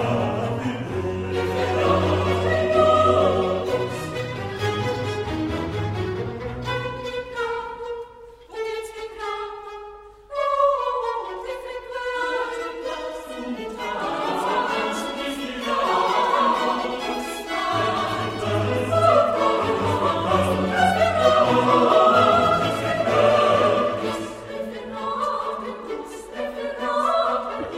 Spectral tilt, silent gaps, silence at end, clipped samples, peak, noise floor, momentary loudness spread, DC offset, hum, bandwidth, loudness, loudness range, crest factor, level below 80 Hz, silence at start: -5.5 dB/octave; none; 0 s; under 0.1%; -4 dBFS; -44 dBFS; 14 LU; under 0.1%; none; 15.5 kHz; -22 LUFS; 10 LU; 18 dB; -50 dBFS; 0 s